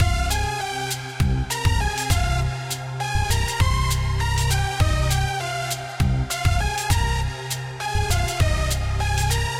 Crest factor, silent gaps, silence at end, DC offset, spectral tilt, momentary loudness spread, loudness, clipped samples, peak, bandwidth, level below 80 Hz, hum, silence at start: 14 dB; none; 0 s; under 0.1%; -4 dB/octave; 5 LU; -23 LUFS; under 0.1%; -6 dBFS; 17 kHz; -26 dBFS; none; 0 s